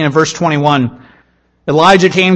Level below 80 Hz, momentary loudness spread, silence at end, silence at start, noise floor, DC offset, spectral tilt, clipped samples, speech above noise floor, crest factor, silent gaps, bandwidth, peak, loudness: -46 dBFS; 11 LU; 0 s; 0 s; -53 dBFS; under 0.1%; -5 dB/octave; 0.4%; 43 dB; 12 dB; none; 11 kHz; 0 dBFS; -11 LUFS